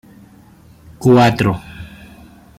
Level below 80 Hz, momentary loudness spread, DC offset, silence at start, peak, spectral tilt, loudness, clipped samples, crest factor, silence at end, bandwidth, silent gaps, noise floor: -44 dBFS; 24 LU; under 0.1%; 1 s; -2 dBFS; -7 dB/octave; -14 LUFS; under 0.1%; 16 dB; 0.75 s; 15.5 kHz; none; -45 dBFS